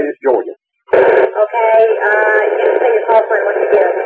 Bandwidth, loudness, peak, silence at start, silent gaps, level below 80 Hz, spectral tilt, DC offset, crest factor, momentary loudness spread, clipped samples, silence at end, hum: 7 kHz; -12 LUFS; 0 dBFS; 0 s; none; -62 dBFS; -6 dB/octave; under 0.1%; 10 dB; 5 LU; under 0.1%; 0 s; none